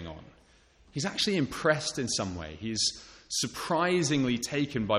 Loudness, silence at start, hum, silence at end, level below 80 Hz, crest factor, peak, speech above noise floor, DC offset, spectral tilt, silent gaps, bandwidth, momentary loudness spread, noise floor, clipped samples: -29 LUFS; 0 s; none; 0 s; -56 dBFS; 18 dB; -12 dBFS; 31 dB; under 0.1%; -3.5 dB/octave; none; 13.5 kHz; 11 LU; -61 dBFS; under 0.1%